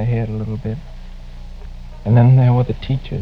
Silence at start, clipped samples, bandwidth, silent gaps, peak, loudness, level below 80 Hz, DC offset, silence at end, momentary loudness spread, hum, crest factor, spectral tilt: 0 s; under 0.1%; 5 kHz; none; 0 dBFS; -16 LUFS; -32 dBFS; under 0.1%; 0 s; 26 LU; 60 Hz at -30 dBFS; 16 dB; -10 dB/octave